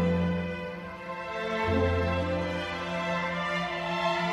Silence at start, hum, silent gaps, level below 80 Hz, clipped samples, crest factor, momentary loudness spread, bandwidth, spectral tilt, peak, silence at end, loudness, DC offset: 0 s; none; none; -46 dBFS; under 0.1%; 14 dB; 10 LU; 10.5 kHz; -6.5 dB/octave; -16 dBFS; 0 s; -30 LUFS; under 0.1%